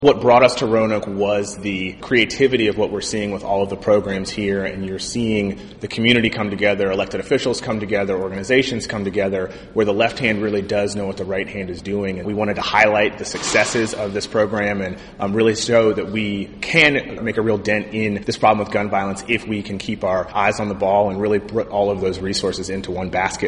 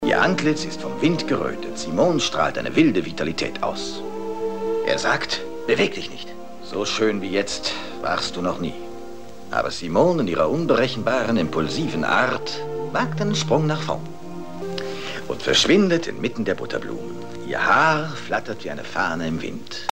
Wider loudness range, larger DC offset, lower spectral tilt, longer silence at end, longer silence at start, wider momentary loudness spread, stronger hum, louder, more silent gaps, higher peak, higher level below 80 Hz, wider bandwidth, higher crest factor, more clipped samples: about the same, 3 LU vs 4 LU; second, under 0.1% vs 2%; about the same, -4.5 dB/octave vs -4.5 dB/octave; about the same, 0 s vs 0 s; about the same, 0 s vs 0 s; second, 9 LU vs 13 LU; neither; first, -19 LUFS vs -22 LUFS; neither; first, 0 dBFS vs -4 dBFS; first, -46 dBFS vs -52 dBFS; second, 10.5 kHz vs 16 kHz; about the same, 20 dB vs 20 dB; neither